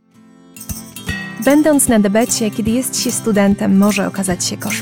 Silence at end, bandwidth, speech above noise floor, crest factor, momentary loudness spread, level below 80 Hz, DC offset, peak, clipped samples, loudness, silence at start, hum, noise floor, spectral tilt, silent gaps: 0 s; 18.5 kHz; 31 dB; 14 dB; 15 LU; -40 dBFS; under 0.1%; -2 dBFS; under 0.1%; -15 LUFS; 0.55 s; none; -45 dBFS; -4.5 dB/octave; none